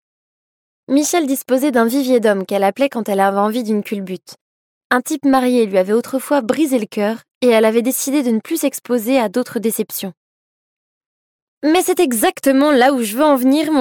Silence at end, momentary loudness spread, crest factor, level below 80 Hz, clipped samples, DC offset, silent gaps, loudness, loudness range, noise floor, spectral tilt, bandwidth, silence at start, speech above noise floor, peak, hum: 0 s; 7 LU; 14 dB; -64 dBFS; under 0.1%; under 0.1%; 4.41-4.90 s, 7.35-7.41 s, 10.17-11.61 s; -16 LUFS; 4 LU; under -90 dBFS; -4 dB/octave; 17.5 kHz; 0.9 s; over 75 dB; -2 dBFS; none